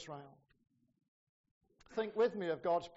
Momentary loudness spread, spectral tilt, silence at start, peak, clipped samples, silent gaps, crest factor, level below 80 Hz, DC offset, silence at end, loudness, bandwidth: 15 LU; -4 dB/octave; 0 s; -24 dBFS; under 0.1%; 1.08-1.44 s, 1.51-1.61 s; 18 dB; -78 dBFS; under 0.1%; 0.05 s; -37 LUFS; 7.6 kHz